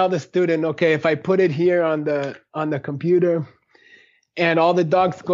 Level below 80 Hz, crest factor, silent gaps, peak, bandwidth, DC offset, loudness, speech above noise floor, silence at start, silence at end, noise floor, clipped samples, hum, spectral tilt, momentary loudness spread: -68 dBFS; 14 dB; none; -6 dBFS; 7.4 kHz; under 0.1%; -20 LUFS; 34 dB; 0 s; 0 s; -53 dBFS; under 0.1%; none; -5.5 dB/octave; 8 LU